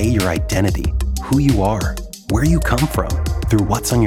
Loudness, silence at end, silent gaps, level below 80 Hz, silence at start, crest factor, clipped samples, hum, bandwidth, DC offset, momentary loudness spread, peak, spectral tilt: -18 LUFS; 0 s; none; -24 dBFS; 0 s; 14 dB; under 0.1%; none; 17 kHz; under 0.1%; 6 LU; -2 dBFS; -6 dB/octave